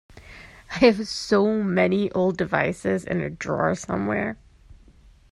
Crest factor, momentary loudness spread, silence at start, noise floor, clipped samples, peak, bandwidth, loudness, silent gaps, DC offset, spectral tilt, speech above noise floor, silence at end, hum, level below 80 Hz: 20 dB; 12 LU; 0.15 s; -52 dBFS; under 0.1%; -4 dBFS; 11.5 kHz; -23 LUFS; none; under 0.1%; -6 dB/octave; 30 dB; 0.6 s; none; -52 dBFS